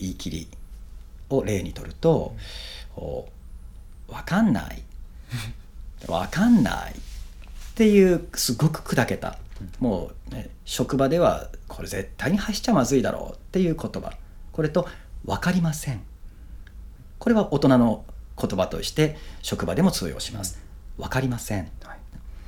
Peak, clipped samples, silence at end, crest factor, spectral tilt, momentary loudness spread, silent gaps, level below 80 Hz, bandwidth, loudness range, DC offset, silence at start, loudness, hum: -4 dBFS; under 0.1%; 0.05 s; 22 dB; -5.5 dB/octave; 23 LU; none; -40 dBFS; 19 kHz; 6 LU; under 0.1%; 0 s; -24 LUFS; none